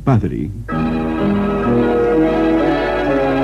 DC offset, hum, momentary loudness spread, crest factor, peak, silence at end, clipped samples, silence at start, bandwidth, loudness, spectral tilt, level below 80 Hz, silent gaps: under 0.1%; none; 6 LU; 14 dB; -2 dBFS; 0 s; under 0.1%; 0 s; 9.2 kHz; -16 LUFS; -8.5 dB/octave; -32 dBFS; none